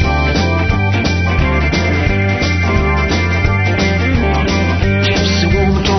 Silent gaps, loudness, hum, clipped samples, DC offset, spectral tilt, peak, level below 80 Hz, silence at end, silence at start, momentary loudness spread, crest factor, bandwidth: none; -14 LUFS; none; under 0.1%; under 0.1%; -6 dB/octave; 0 dBFS; -20 dBFS; 0 s; 0 s; 1 LU; 12 dB; 6.4 kHz